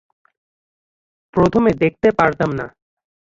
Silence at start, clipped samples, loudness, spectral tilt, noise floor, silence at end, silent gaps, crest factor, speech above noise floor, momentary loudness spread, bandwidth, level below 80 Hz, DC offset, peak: 1.35 s; under 0.1%; -17 LUFS; -8 dB/octave; under -90 dBFS; 0.65 s; none; 18 dB; over 74 dB; 11 LU; 7.6 kHz; -46 dBFS; under 0.1%; -2 dBFS